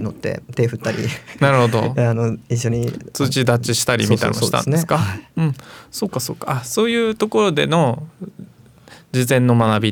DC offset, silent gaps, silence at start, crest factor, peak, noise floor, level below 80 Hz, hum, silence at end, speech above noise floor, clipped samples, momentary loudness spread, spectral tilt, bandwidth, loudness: under 0.1%; none; 0 s; 18 dB; 0 dBFS; -45 dBFS; -52 dBFS; none; 0 s; 27 dB; under 0.1%; 10 LU; -5.5 dB/octave; 19 kHz; -18 LUFS